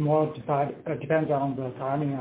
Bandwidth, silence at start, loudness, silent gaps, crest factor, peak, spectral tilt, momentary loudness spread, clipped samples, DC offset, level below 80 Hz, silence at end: 4 kHz; 0 s; -28 LUFS; none; 14 dB; -12 dBFS; -12 dB/octave; 6 LU; under 0.1%; under 0.1%; -62 dBFS; 0 s